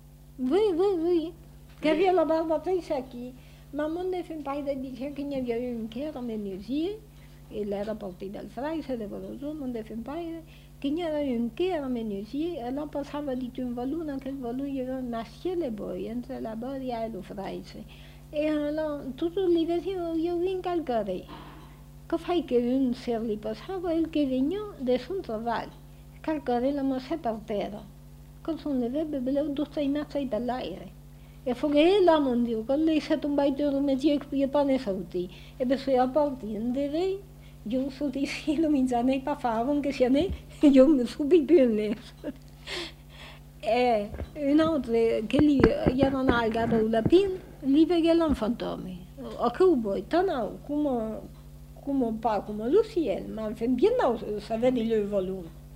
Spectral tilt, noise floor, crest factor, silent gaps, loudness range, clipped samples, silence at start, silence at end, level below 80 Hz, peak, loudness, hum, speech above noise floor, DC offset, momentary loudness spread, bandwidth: -7 dB/octave; -48 dBFS; 24 dB; none; 10 LU; under 0.1%; 0.05 s; 0 s; -48 dBFS; -4 dBFS; -28 LUFS; none; 21 dB; under 0.1%; 14 LU; 16 kHz